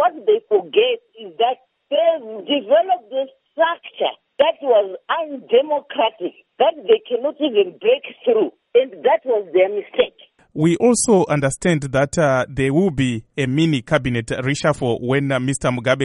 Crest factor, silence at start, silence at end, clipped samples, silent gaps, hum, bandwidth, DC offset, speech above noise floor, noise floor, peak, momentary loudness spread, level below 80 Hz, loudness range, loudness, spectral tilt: 16 dB; 0 s; 0 s; under 0.1%; none; none; 11.5 kHz; under 0.1%; 21 dB; -40 dBFS; -2 dBFS; 7 LU; -50 dBFS; 2 LU; -19 LUFS; -5 dB/octave